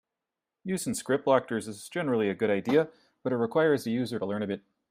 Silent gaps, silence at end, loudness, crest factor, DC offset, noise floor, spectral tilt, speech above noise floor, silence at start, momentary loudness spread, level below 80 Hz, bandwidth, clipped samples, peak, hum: none; 0.3 s; -29 LUFS; 20 dB; under 0.1%; -88 dBFS; -5.5 dB/octave; 60 dB; 0.65 s; 11 LU; -72 dBFS; 15.5 kHz; under 0.1%; -8 dBFS; none